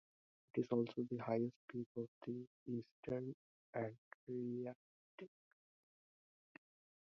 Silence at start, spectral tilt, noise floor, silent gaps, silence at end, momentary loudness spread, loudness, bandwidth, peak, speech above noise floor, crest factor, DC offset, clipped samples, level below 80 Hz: 0.55 s; -8 dB/octave; under -90 dBFS; 1.56-1.68 s, 1.86-1.95 s, 2.08-2.21 s, 2.47-2.66 s, 2.91-3.03 s, 3.34-3.73 s, 3.98-4.27 s, 4.75-5.18 s; 1.75 s; 19 LU; -46 LUFS; 6.4 kHz; -26 dBFS; over 46 dB; 20 dB; under 0.1%; under 0.1%; -84 dBFS